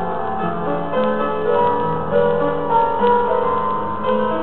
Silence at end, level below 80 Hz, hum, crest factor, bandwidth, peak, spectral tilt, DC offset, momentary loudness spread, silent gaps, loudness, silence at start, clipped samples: 0 s; -44 dBFS; none; 14 dB; 4.3 kHz; -4 dBFS; -10 dB/octave; 4%; 6 LU; none; -19 LUFS; 0 s; under 0.1%